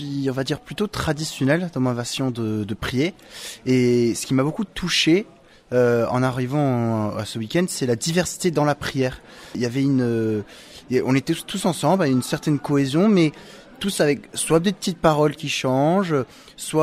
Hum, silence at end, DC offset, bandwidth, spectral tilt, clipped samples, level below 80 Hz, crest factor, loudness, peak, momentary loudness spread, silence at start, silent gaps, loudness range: none; 0 s; under 0.1%; 16 kHz; -5.5 dB/octave; under 0.1%; -50 dBFS; 18 dB; -22 LUFS; -4 dBFS; 8 LU; 0 s; none; 3 LU